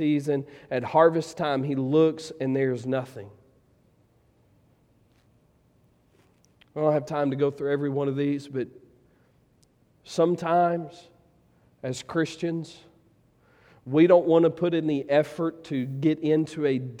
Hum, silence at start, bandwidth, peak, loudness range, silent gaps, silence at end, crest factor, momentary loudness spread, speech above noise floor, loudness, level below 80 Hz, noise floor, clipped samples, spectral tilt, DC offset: none; 0 s; 11 kHz; -4 dBFS; 10 LU; none; 0 s; 22 dB; 13 LU; 38 dB; -25 LUFS; -70 dBFS; -63 dBFS; under 0.1%; -7 dB/octave; under 0.1%